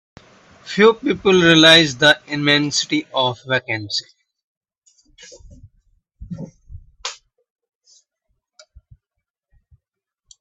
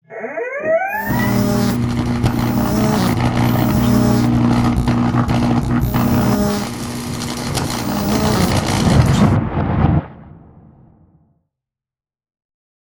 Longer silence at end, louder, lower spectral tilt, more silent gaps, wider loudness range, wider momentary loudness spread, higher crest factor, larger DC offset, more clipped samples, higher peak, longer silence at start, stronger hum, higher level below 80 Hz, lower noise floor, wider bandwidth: first, 3.25 s vs 2.45 s; about the same, -15 LUFS vs -17 LUFS; second, -3.5 dB/octave vs -6 dB/octave; first, 4.43-4.61 s, 4.78-4.82 s vs none; first, 24 LU vs 3 LU; first, 23 LU vs 8 LU; about the same, 20 dB vs 16 dB; neither; neither; about the same, 0 dBFS vs 0 dBFS; first, 0.65 s vs 0.1 s; neither; second, -52 dBFS vs -30 dBFS; second, -80 dBFS vs under -90 dBFS; second, 13.5 kHz vs over 20 kHz